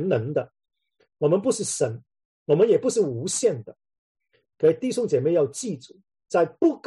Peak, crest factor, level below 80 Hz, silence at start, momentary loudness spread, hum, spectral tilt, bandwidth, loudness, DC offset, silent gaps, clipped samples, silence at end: -8 dBFS; 16 dB; -70 dBFS; 0 s; 13 LU; none; -5.5 dB/octave; 12 kHz; -23 LUFS; under 0.1%; 2.25-2.46 s, 3.98-4.15 s; under 0.1%; 0.1 s